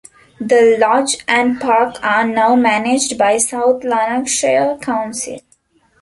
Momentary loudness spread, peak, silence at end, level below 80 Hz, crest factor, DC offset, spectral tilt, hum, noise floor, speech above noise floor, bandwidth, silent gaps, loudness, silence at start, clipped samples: 8 LU; 0 dBFS; 0.6 s; -56 dBFS; 14 dB; under 0.1%; -2.5 dB/octave; none; -56 dBFS; 41 dB; 11.5 kHz; none; -14 LUFS; 0.4 s; under 0.1%